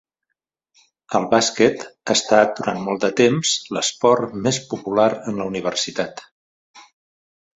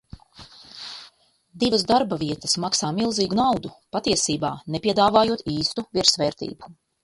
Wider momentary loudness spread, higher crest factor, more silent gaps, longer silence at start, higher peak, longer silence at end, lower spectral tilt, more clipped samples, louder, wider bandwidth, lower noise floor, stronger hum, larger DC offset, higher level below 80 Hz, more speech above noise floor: second, 9 LU vs 18 LU; about the same, 20 dB vs 22 dB; first, 6.31-6.74 s vs none; first, 1.1 s vs 0.15 s; about the same, -2 dBFS vs -2 dBFS; first, 0.75 s vs 0.3 s; about the same, -3.5 dB/octave vs -3.5 dB/octave; neither; first, -19 LUFS vs -22 LUFS; second, 8.2 kHz vs 11.5 kHz; first, -80 dBFS vs -56 dBFS; neither; neither; second, -60 dBFS vs -54 dBFS; first, 60 dB vs 34 dB